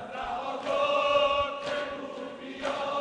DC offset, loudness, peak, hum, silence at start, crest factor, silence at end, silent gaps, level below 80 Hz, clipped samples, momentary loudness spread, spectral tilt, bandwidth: under 0.1%; -29 LUFS; -14 dBFS; none; 0 s; 16 dB; 0 s; none; -58 dBFS; under 0.1%; 14 LU; -3.5 dB/octave; 10 kHz